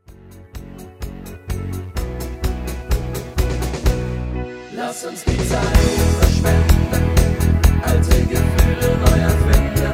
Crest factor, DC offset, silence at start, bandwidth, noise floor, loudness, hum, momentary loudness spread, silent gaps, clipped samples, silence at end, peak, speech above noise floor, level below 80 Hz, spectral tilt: 16 dB; under 0.1%; 0.1 s; 16.5 kHz; -41 dBFS; -18 LUFS; none; 16 LU; none; under 0.1%; 0 s; 0 dBFS; 25 dB; -20 dBFS; -6 dB/octave